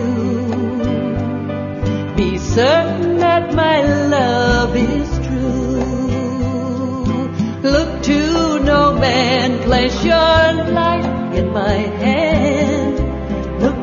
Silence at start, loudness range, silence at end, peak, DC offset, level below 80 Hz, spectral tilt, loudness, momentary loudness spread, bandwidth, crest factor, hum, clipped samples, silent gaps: 0 s; 4 LU; 0 s; -2 dBFS; under 0.1%; -28 dBFS; -6 dB/octave; -16 LUFS; 7 LU; 7.4 kHz; 14 dB; none; under 0.1%; none